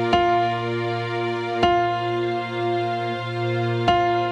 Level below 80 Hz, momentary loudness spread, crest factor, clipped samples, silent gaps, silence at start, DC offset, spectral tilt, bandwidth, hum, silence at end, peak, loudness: -50 dBFS; 6 LU; 18 dB; under 0.1%; none; 0 s; under 0.1%; -6.5 dB/octave; 9 kHz; none; 0 s; -4 dBFS; -22 LUFS